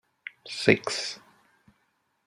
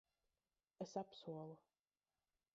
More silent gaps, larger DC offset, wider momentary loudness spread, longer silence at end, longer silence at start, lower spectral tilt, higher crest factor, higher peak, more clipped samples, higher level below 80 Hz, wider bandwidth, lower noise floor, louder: neither; neither; first, 21 LU vs 9 LU; first, 1.1 s vs 0.95 s; second, 0.45 s vs 0.8 s; second, -4 dB/octave vs -6.5 dB/octave; first, 28 dB vs 22 dB; first, -2 dBFS vs -32 dBFS; neither; first, -68 dBFS vs under -90 dBFS; first, 13.5 kHz vs 7.6 kHz; second, -73 dBFS vs under -90 dBFS; first, -26 LUFS vs -52 LUFS